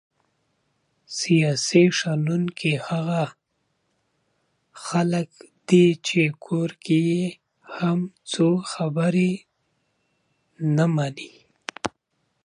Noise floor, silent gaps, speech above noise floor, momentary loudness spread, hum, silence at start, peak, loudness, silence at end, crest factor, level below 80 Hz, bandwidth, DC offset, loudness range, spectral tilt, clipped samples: -73 dBFS; none; 52 dB; 16 LU; none; 1.1 s; -4 dBFS; -23 LUFS; 0.55 s; 20 dB; -68 dBFS; 11 kHz; under 0.1%; 4 LU; -5.5 dB/octave; under 0.1%